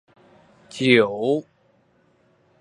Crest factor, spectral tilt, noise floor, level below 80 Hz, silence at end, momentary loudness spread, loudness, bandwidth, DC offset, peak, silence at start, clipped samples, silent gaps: 22 dB; -5.5 dB/octave; -61 dBFS; -68 dBFS; 1.2 s; 11 LU; -20 LUFS; 11 kHz; under 0.1%; -2 dBFS; 0.75 s; under 0.1%; none